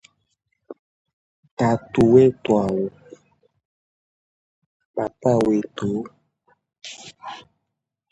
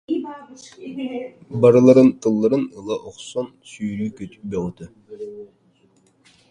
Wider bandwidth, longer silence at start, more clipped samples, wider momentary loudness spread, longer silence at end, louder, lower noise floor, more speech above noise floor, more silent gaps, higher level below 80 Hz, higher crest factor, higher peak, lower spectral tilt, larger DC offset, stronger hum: about the same, 10.5 kHz vs 10 kHz; first, 0.7 s vs 0.1 s; neither; about the same, 23 LU vs 23 LU; second, 0.7 s vs 1.05 s; about the same, -20 LUFS vs -19 LUFS; first, -81 dBFS vs -59 dBFS; first, 62 dB vs 39 dB; first, 0.79-1.05 s, 1.13-1.43 s, 1.51-1.57 s, 3.65-4.80 s, 4.86-4.94 s vs none; about the same, -54 dBFS vs -56 dBFS; about the same, 22 dB vs 20 dB; about the same, -2 dBFS vs 0 dBFS; about the same, -7.5 dB/octave vs -7.5 dB/octave; neither; neither